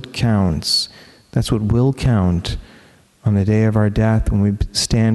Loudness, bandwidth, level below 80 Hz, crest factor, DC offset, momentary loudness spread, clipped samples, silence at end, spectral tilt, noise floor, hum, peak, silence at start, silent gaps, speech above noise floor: -18 LUFS; 12.5 kHz; -30 dBFS; 14 dB; under 0.1%; 8 LU; under 0.1%; 0 s; -6 dB/octave; -48 dBFS; none; -4 dBFS; 0 s; none; 32 dB